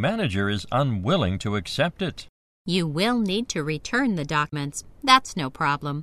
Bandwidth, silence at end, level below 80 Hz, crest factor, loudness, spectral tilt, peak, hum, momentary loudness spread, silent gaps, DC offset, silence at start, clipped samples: 14 kHz; 0 s; -50 dBFS; 24 dB; -24 LUFS; -5 dB/octave; 0 dBFS; none; 12 LU; 2.29-2.65 s; under 0.1%; 0 s; under 0.1%